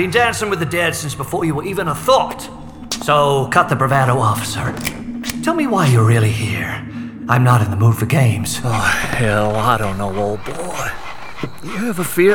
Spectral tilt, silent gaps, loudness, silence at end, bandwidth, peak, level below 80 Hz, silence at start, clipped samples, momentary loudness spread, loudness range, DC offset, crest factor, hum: -5.5 dB/octave; none; -17 LUFS; 0 s; over 20 kHz; 0 dBFS; -40 dBFS; 0 s; under 0.1%; 12 LU; 3 LU; under 0.1%; 16 dB; none